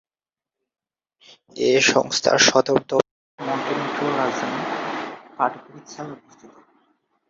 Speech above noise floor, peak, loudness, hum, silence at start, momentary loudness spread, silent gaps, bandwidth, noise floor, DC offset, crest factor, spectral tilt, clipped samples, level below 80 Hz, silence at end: over 69 dB; -2 dBFS; -20 LUFS; none; 1.55 s; 21 LU; 3.11-3.38 s; 7.8 kHz; under -90 dBFS; under 0.1%; 22 dB; -2.5 dB/octave; under 0.1%; -66 dBFS; 0.85 s